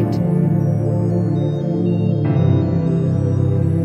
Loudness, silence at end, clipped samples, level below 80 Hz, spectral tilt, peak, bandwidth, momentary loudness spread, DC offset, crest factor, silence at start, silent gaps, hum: -17 LUFS; 0 s; under 0.1%; -42 dBFS; -10.5 dB/octave; -4 dBFS; 6 kHz; 3 LU; under 0.1%; 12 dB; 0 s; none; none